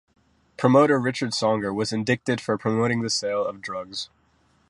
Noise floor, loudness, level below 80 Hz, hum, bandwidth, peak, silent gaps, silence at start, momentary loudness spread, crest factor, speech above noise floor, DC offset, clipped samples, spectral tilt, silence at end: -63 dBFS; -23 LUFS; -62 dBFS; none; 11.5 kHz; -4 dBFS; none; 0.6 s; 14 LU; 20 dB; 40 dB; under 0.1%; under 0.1%; -5 dB/octave; 0.65 s